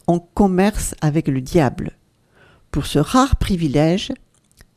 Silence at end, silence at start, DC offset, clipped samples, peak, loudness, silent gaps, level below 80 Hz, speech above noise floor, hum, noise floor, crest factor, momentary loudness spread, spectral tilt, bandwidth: 0.6 s; 0.1 s; under 0.1%; under 0.1%; 0 dBFS; -18 LUFS; none; -30 dBFS; 37 dB; none; -54 dBFS; 18 dB; 12 LU; -6 dB/octave; 15.5 kHz